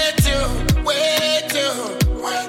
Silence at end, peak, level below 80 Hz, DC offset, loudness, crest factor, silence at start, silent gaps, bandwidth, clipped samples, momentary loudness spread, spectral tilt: 0 s; -4 dBFS; -26 dBFS; under 0.1%; -18 LUFS; 14 dB; 0 s; none; 17 kHz; under 0.1%; 4 LU; -4 dB/octave